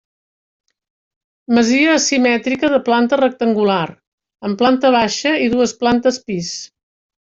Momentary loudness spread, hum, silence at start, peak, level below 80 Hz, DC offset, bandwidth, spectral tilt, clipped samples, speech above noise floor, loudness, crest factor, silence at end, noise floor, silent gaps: 11 LU; none; 1.5 s; -2 dBFS; -54 dBFS; under 0.1%; 7.8 kHz; -4 dB/octave; under 0.1%; over 75 dB; -15 LUFS; 14 dB; 0.6 s; under -90 dBFS; 4.07-4.18 s